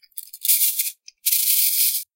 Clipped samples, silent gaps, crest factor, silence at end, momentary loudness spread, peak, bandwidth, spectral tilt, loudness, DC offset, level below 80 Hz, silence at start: under 0.1%; none; 20 dB; 0.15 s; 10 LU; 0 dBFS; 17.5 kHz; 12 dB/octave; -18 LUFS; under 0.1%; under -90 dBFS; 0.15 s